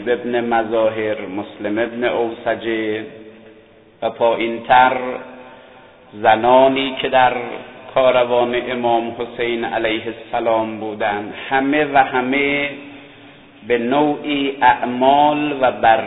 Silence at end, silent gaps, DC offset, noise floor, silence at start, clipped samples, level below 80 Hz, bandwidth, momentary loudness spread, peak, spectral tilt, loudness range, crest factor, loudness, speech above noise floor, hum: 0 s; none; 0.1%; -47 dBFS; 0 s; under 0.1%; -54 dBFS; 4.1 kHz; 12 LU; 0 dBFS; -8.5 dB/octave; 5 LU; 18 dB; -17 LUFS; 30 dB; none